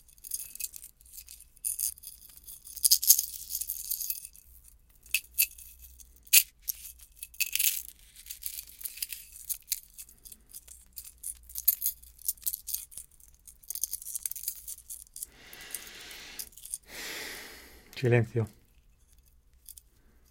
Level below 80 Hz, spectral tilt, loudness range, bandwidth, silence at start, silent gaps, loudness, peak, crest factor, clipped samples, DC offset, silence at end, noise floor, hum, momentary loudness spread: -60 dBFS; -2 dB/octave; 11 LU; 17 kHz; 0.25 s; none; -30 LUFS; 0 dBFS; 34 dB; under 0.1%; under 0.1%; 0.6 s; -62 dBFS; none; 24 LU